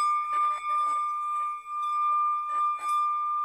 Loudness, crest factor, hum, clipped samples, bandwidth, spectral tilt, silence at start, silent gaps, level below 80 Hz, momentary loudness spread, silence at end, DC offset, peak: -27 LUFS; 8 dB; none; under 0.1%; 12.5 kHz; 0.5 dB/octave; 0 s; none; -72 dBFS; 4 LU; 0 s; under 0.1%; -20 dBFS